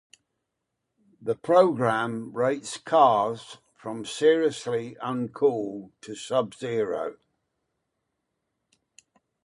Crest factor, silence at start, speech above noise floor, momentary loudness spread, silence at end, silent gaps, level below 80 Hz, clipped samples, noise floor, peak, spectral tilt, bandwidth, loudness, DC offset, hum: 22 dB; 1.2 s; 57 dB; 17 LU; 2.35 s; none; -72 dBFS; under 0.1%; -82 dBFS; -4 dBFS; -5 dB/octave; 11.5 kHz; -25 LUFS; under 0.1%; none